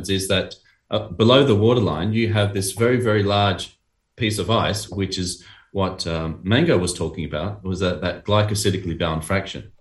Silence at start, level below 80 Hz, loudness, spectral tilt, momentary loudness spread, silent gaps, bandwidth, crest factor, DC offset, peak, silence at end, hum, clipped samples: 0 s; -44 dBFS; -21 LUFS; -5 dB/octave; 11 LU; none; 12.5 kHz; 20 dB; under 0.1%; 0 dBFS; 0.15 s; none; under 0.1%